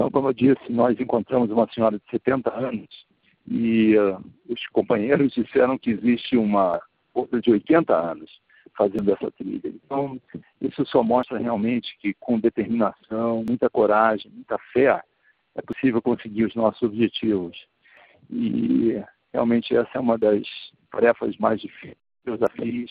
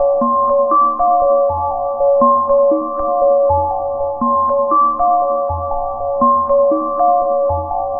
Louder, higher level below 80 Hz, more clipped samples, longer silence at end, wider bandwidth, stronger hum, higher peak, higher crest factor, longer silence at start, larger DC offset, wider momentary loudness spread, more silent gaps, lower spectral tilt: second, -23 LUFS vs -14 LUFS; second, -60 dBFS vs -38 dBFS; neither; about the same, 0 s vs 0 s; first, 4.9 kHz vs 1.7 kHz; neither; about the same, -4 dBFS vs -2 dBFS; first, 18 dB vs 12 dB; about the same, 0 s vs 0 s; neither; first, 12 LU vs 7 LU; neither; second, -5.5 dB/octave vs -14.5 dB/octave